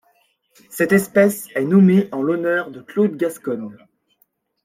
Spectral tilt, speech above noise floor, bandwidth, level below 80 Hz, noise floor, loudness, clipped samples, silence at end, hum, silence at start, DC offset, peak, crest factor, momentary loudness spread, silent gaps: -7 dB/octave; 47 dB; 16.5 kHz; -64 dBFS; -64 dBFS; -18 LUFS; under 0.1%; 0.9 s; none; 0.7 s; under 0.1%; -2 dBFS; 16 dB; 13 LU; none